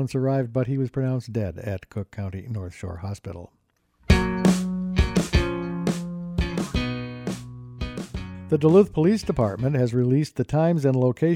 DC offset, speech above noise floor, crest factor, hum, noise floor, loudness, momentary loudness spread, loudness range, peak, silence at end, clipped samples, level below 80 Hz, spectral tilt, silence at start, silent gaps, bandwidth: under 0.1%; 41 dB; 20 dB; none; -63 dBFS; -24 LUFS; 14 LU; 7 LU; -4 dBFS; 0 s; under 0.1%; -34 dBFS; -7 dB/octave; 0 s; none; 15.5 kHz